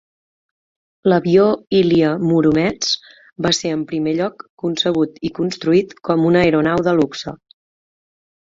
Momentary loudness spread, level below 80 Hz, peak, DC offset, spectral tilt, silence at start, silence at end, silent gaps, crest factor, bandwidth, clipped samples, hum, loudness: 9 LU; -52 dBFS; -2 dBFS; under 0.1%; -5.5 dB/octave; 1.05 s; 1.1 s; 4.49-4.58 s; 16 dB; 7.8 kHz; under 0.1%; none; -17 LUFS